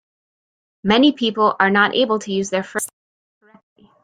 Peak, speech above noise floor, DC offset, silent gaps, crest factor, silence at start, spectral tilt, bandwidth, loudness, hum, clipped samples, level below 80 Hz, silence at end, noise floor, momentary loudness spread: -2 dBFS; over 73 dB; under 0.1%; none; 18 dB; 0.85 s; -4 dB/octave; 16 kHz; -17 LUFS; none; under 0.1%; -56 dBFS; 1.15 s; under -90 dBFS; 11 LU